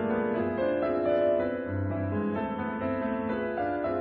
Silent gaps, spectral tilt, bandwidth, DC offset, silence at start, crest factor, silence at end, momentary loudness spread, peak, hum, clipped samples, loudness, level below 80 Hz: none; -11 dB/octave; 5 kHz; under 0.1%; 0 s; 14 dB; 0 s; 6 LU; -14 dBFS; none; under 0.1%; -29 LUFS; -58 dBFS